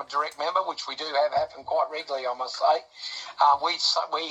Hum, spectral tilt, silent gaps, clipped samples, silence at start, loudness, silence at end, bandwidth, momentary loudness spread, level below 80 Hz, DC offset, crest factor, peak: none; -0.5 dB/octave; none; under 0.1%; 0 s; -26 LUFS; 0 s; 9.6 kHz; 10 LU; -72 dBFS; under 0.1%; 18 dB; -8 dBFS